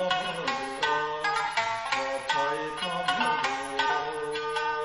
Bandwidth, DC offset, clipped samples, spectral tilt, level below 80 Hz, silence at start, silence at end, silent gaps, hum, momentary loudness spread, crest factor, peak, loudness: 12.5 kHz; under 0.1%; under 0.1%; -2.5 dB/octave; -62 dBFS; 0 s; 0 s; none; none; 4 LU; 16 dB; -12 dBFS; -28 LUFS